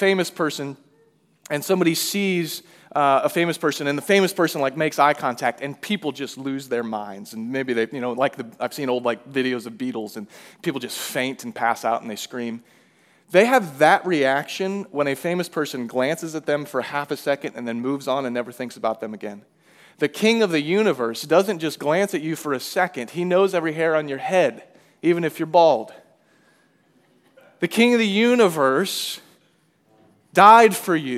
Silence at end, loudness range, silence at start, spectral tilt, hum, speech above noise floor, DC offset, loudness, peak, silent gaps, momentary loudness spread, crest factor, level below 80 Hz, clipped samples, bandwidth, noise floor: 0 s; 6 LU; 0 s; -4.5 dB/octave; none; 41 dB; under 0.1%; -21 LUFS; 0 dBFS; none; 13 LU; 22 dB; -82 dBFS; under 0.1%; 16 kHz; -62 dBFS